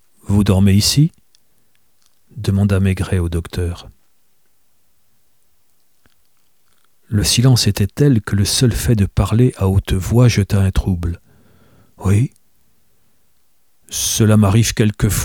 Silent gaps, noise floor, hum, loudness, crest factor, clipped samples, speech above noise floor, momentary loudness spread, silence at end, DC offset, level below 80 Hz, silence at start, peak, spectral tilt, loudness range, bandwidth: none; -63 dBFS; none; -16 LUFS; 16 dB; under 0.1%; 49 dB; 11 LU; 0 s; 0.2%; -32 dBFS; 0.3 s; 0 dBFS; -5.5 dB/octave; 9 LU; 18.5 kHz